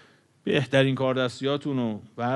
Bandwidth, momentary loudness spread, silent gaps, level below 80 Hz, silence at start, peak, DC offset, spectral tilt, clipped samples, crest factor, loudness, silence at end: 11.5 kHz; 9 LU; none; -68 dBFS; 0.45 s; -8 dBFS; under 0.1%; -6.5 dB/octave; under 0.1%; 18 dB; -25 LUFS; 0 s